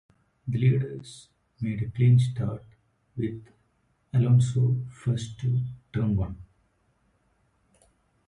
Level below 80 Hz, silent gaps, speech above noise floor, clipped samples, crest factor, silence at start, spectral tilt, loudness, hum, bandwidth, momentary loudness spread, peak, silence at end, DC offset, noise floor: -50 dBFS; none; 45 dB; under 0.1%; 16 dB; 0.45 s; -8 dB/octave; -26 LUFS; none; 10.5 kHz; 20 LU; -10 dBFS; 1.85 s; under 0.1%; -70 dBFS